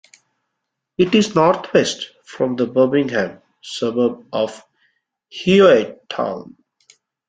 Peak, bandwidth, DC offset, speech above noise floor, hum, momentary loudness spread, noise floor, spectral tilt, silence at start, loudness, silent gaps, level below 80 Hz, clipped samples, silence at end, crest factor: -2 dBFS; 9.4 kHz; under 0.1%; 61 dB; none; 18 LU; -78 dBFS; -5.5 dB/octave; 1 s; -18 LUFS; none; -60 dBFS; under 0.1%; 0.85 s; 18 dB